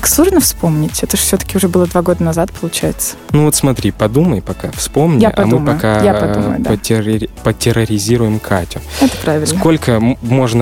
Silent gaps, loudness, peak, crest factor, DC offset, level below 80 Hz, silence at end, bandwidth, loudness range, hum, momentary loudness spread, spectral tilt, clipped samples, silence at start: none; -13 LUFS; 0 dBFS; 12 dB; under 0.1%; -30 dBFS; 0 s; 17.5 kHz; 2 LU; none; 6 LU; -5 dB/octave; under 0.1%; 0 s